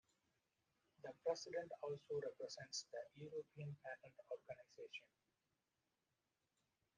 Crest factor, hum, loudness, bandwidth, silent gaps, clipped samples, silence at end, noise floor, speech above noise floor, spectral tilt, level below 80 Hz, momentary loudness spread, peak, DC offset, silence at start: 22 dB; none; -51 LUFS; 9 kHz; none; under 0.1%; 1.95 s; under -90 dBFS; over 39 dB; -3.5 dB/octave; under -90 dBFS; 11 LU; -30 dBFS; under 0.1%; 1 s